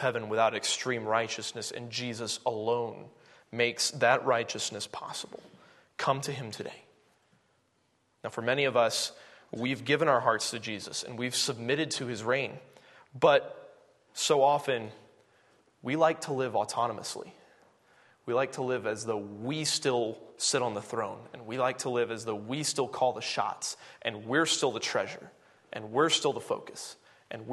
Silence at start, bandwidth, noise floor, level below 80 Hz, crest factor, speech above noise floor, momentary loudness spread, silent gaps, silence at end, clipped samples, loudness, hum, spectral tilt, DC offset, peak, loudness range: 0 s; 12.5 kHz; -72 dBFS; -78 dBFS; 22 dB; 42 dB; 17 LU; none; 0 s; under 0.1%; -30 LUFS; none; -3 dB/octave; under 0.1%; -10 dBFS; 4 LU